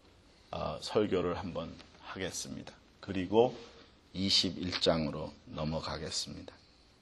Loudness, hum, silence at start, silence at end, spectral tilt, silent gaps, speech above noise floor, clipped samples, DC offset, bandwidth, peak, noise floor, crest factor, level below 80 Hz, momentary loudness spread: -33 LUFS; none; 0.5 s; 0.45 s; -4 dB/octave; none; 28 dB; under 0.1%; under 0.1%; 12.5 kHz; -12 dBFS; -61 dBFS; 22 dB; -58 dBFS; 21 LU